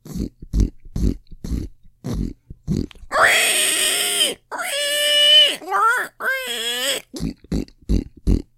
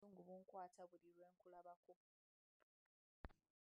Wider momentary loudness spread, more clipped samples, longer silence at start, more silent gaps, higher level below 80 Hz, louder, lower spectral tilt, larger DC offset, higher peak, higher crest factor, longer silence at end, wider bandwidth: first, 17 LU vs 8 LU; neither; about the same, 0.05 s vs 0 s; second, none vs 1.76-1.83 s, 1.96-3.24 s; first, -30 dBFS vs -74 dBFS; first, -18 LUFS vs -63 LUFS; second, -2 dB/octave vs -6.5 dB/octave; neither; first, -2 dBFS vs -36 dBFS; second, 18 dB vs 28 dB; second, 0.15 s vs 0.45 s; first, 16 kHz vs 5.2 kHz